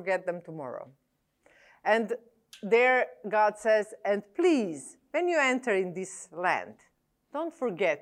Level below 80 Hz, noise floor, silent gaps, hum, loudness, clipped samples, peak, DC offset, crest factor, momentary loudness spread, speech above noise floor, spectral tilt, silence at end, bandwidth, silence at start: -80 dBFS; -66 dBFS; none; none; -28 LUFS; under 0.1%; -12 dBFS; under 0.1%; 18 dB; 15 LU; 38 dB; -4.5 dB/octave; 0.05 s; 12 kHz; 0 s